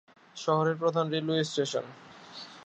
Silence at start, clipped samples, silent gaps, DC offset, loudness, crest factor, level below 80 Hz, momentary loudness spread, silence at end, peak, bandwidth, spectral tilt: 0.35 s; under 0.1%; none; under 0.1%; -29 LUFS; 18 dB; -78 dBFS; 19 LU; 0 s; -12 dBFS; 8.8 kHz; -5 dB/octave